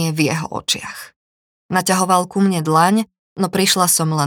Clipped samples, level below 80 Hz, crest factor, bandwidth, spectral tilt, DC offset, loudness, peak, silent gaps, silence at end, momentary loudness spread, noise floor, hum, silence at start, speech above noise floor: under 0.1%; -60 dBFS; 16 dB; 20 kHz; -4 dB/octave; under 0.1%; -17 LUFS; 0 dBFS; 1.16-1.69 s, 3.19-3.36 s; 0 s; 9 LU; under -90 dBFS; none; 0 s; over 73 dB